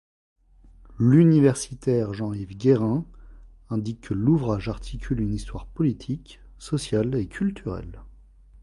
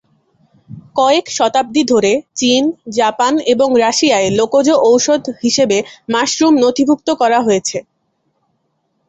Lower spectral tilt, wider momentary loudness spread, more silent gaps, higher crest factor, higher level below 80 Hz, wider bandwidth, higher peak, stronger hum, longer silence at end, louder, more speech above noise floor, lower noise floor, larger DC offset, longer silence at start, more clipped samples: first, -7.5 dB/octave vs -3 dB/octave; first, 16 LU vs 5 LU; neither; first, 18 dB vs 12 dB; first, -42 dBFS vs -56 dBFS; first, 11.5 kHz vs 8.4 kHz; second, -6 dBFS vs -2 dBFS; neither; second, 0.55 s vs 1.3 s; second, -24 LUFS vs -13 LUFS; second, 28 dB vs 53 dB; second, -51 dBFS vs -65 dBFS; neither; first, 0.9 s vs 0.7 s; neither